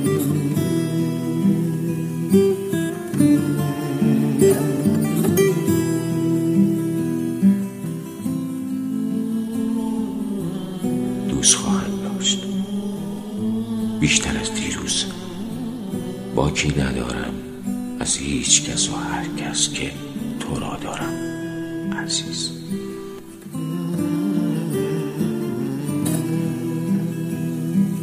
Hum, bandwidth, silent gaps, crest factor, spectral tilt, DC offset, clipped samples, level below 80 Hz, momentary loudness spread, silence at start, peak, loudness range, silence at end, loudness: none; 15.5 kHz; none; 22 dB; -4.5 dB/octave; under 0.1%; under 0.1%; -44 dBFS; 11 LU; 0 s; 0 dBFS; 6 LU; 0 s; -22 LUFS